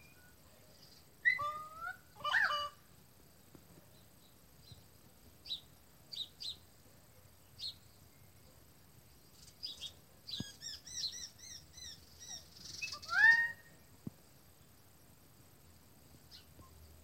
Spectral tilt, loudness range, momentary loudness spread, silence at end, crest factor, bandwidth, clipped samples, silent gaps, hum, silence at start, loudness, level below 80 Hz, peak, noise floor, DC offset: -1 dB/octave; 17 LU; 27 LU; 0.1 s; 26 dB; 16 kHz; under 0.1%; none; none; 0.8 s; -36 LUFS; -70 dBFS; -16 dBFS; -64 dBFS; under 0.1%